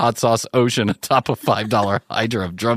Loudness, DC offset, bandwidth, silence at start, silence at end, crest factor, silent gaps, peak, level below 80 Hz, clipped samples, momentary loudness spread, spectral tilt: -19 LUFS; under 0.1%; 15.5 kHz; 0 s; 0 s; 16 dB; none; -2 dBFS; -54 dBFS; under 0.1%; 4 LU; -5 dB/octave